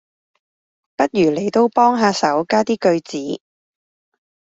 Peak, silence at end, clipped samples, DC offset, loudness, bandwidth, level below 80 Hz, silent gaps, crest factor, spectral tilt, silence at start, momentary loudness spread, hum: -2 dBFS; 1.1 s; under 0.1%; under 0.1%; -17 LUFS; 8 kHz; -62 dBFS; none; 18 dB; -5 dB/octave; 1 s; 13 LU; none